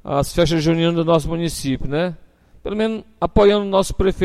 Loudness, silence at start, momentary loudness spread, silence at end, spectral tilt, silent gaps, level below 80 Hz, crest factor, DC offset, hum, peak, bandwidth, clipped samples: -19 LUFS; 0.05 s; 10 LU; 0 s; -6 dB/octave; none; -32 dBFS; 14 dB; under 0.1%; none; -4 dBFS; 14 kHz; under 0.1%